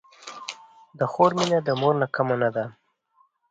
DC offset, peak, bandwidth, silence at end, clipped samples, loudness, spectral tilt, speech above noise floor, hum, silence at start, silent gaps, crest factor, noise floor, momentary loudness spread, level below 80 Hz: under 0.1%; -4 dBFS; 9.2 kHz; 0.8 s; under 0.1%; -23 LUFS; -5.5 dB/octave; 42 dB; none; 0.2 s; none; 20 dB; -65 dBFS; 17 LU; -68 dBFS